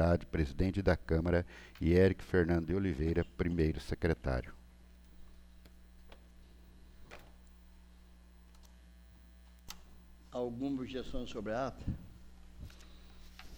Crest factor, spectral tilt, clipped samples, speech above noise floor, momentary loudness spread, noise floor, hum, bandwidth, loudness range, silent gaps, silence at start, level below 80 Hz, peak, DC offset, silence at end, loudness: 20 dB; -8 dB/octave; under 0.1%; 25 dB; 24 LU; -58 dBFS; 60 Hz at -60 dBFS; over 20 kHz; 17 LU; none; 0 s; -46 dBFS; -16 dBFS; under 0.1%; 0 s; -35 LUFS